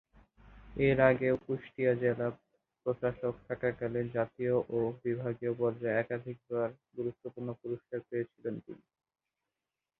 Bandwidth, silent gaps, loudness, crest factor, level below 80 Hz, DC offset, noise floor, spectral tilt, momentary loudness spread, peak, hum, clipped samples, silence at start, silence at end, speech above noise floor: 4.2 kHz; none; -34 LUFS; 24 dB; -62 dBFS; under 0.1%; under -90 dBFS; -10.5 dB/octave; 11 LU; -10 dBFS; none; under 0.1%; 0.45 s; 1.25 s; over 57 dB